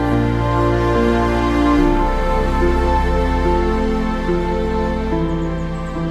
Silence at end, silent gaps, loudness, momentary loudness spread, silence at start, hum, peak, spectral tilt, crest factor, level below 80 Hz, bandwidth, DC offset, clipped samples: 0 s; none; -18 LUFS; 5 LU; 0 s; none; -2 dBFS; -7.5 dB/octave; 14 dB; -22 dBFS; 12 kHz; under 0.1%; under 0.1%